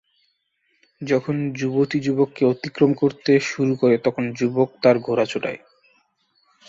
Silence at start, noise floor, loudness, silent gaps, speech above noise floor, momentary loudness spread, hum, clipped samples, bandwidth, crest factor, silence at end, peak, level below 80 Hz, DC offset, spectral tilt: 1 s; -69 dBFS; -21 LUFS; none; 49 dB; 6 LU; none; under 0.1%; 7.8 kHz; 18 dB; 1.1 s; -4 dBFS; -64 dBFS; under 0.1%; -6.5 dB/octave